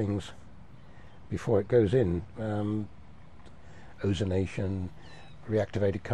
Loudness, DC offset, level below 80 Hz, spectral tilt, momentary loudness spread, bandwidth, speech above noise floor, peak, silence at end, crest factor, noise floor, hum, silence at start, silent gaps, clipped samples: -30 LUFS; 0.5%; -52 dBFS; -8 dB/octave; 19 LU; 10 kHz; 24 dB; -12 dBFS; 0 s; 18 dB; -52 dBFS; none; 0 s; none; under 0.1%